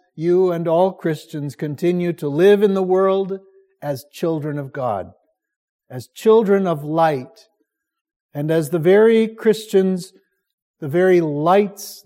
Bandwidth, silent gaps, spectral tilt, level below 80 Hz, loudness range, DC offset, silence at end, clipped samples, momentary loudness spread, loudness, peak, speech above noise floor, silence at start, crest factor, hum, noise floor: 16 kHz; 5.56-5.79 s, 8.01-8.05 s, 8.16-8.29 s, 10.53-10.74 s; -7 dB/octave; -70 dBFS; 4 LU; under 0.1%; 0.05 s; under 0.1%; 15 LU; -18 LUFS; -4 dBFS; 54 dB; 0.15 s; 16 dB; none; -71 dBFS